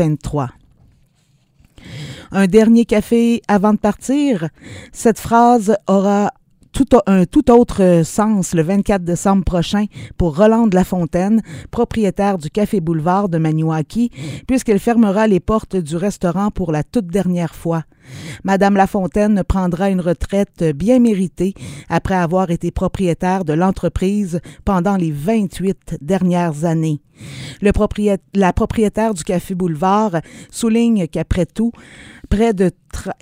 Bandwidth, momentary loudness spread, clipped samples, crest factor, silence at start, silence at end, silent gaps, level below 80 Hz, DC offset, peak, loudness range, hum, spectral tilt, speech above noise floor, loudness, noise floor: 16 kHz; 10 LU; under 0.1%; 16 dB; 0 s; 0.1 s; none; -34 dBFS; under 0.1%; 0 dBFS; 4 LU; none; -7 dB/octave; 42 dB; -16 LUFS; -57 dBFS